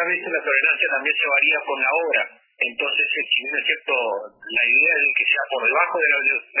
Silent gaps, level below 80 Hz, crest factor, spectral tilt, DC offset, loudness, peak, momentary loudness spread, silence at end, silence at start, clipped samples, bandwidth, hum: none; -82 dBFS; 16 dB; -3.5 dB/octave; under 0.1%; -18 LUFS; -4 dBFS; 6 LU; 0 s; 0 s; under 0.1%; 3.2 kHz; none